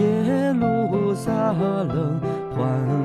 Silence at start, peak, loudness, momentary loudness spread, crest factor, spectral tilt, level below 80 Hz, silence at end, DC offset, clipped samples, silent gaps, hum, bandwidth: 0 s; -8 dBFS; -22 LUFS; 4 LU; 12 dB; -8.5 dB/octave; -50 dBFS; 0 s; under 0.1%; under 0.1%; none; none; 13 kHz